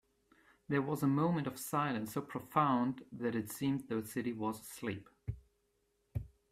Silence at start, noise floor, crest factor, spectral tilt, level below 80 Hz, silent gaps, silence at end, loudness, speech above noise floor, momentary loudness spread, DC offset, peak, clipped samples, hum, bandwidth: 0.7 s; -78 dBFS; 22 dB; -6.5 dB/octave; -62 dBFS; none; 0.25 s; -37 LUFS; 43 dB; 14 LU; under 0.1%; -16 dBFS; under 0.1%; none; 16 kHz